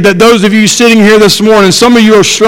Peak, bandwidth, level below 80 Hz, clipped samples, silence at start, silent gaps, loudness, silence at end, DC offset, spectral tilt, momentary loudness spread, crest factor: 0 dBFS; 17 kHz; -36 dBFS; 9%; 0 s; none; -4 LUFS; 0 s; under 0.1%; -4 dB/octave; 2 LU; 4 dB